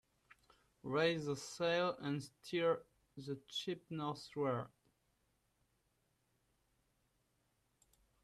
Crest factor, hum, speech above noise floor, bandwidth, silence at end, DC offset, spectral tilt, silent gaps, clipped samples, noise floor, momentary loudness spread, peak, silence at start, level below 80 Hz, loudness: 20 dB; none; 41 dB; 13.5 kHz; 3.55 s; under 0.1%; -5 dB/octave; none; under 0.1%; -81 dBFS; 12 LU; -24 dBFS; 0.85 s; -80 dBFS; -40 LUFS